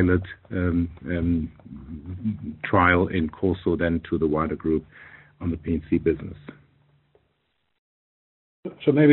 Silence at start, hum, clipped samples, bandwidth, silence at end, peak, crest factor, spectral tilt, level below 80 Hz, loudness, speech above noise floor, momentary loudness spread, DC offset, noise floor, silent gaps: 0 s; none; under 0.1%; 4.2 kHz; 0 s; -4 dBFS; 20 dB; -6.5 dB/octave; -44 dBFS; -25 LUFS; 49 dB; 19 LU; under 0.1%; -73 dBFS; 7.78-8.63 s